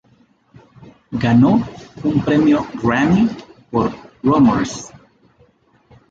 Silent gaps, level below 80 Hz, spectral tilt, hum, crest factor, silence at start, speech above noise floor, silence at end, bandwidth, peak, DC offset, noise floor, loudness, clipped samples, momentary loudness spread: none; -44 dBFS; -7 dB/octave; none; 14 dB; 0.85 s; 40 dB; 1.25 s; 7.8 kHz; -4 dBFS; under 0.1%; -55 dBFS; -16 LUFS; under 0.1%; 15 LU